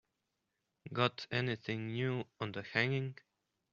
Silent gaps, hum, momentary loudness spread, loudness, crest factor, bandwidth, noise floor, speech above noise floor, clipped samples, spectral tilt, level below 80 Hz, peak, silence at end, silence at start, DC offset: none; none; 9 LU; -37 LUFS; 26 dB; 7.2 kHz; -86 dBFS; 49 dB; under 0.1%; -4 dB/octave; -74 dBFS; -14 dBFS; 0.6 s; 0.85 s; under 0.1%